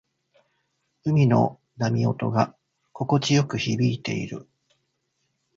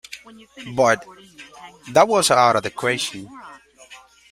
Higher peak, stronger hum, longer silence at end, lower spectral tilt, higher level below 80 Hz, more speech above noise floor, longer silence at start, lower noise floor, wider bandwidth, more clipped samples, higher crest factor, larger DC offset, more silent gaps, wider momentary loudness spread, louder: about the same, -4 dBFS vs -2 dBFS; neither; first, 1.15 s vs 0.35 s; first, -6.5 dB/octave vs -3 dB/octave; about the same, -60 dBFS vs -60 dBFS; first, 52 dB vs 26 dB; first, 1.05 s vs 0.1 s; first, -75 dBFS vs -46 dBFS; second, 7.6 kHz vs 16 kHz; neither; about the same, 20 dB vs 20 dB; neither; neither; second, 12 LU vs 25 LU; second, -24 LUFS vs -18 LUFS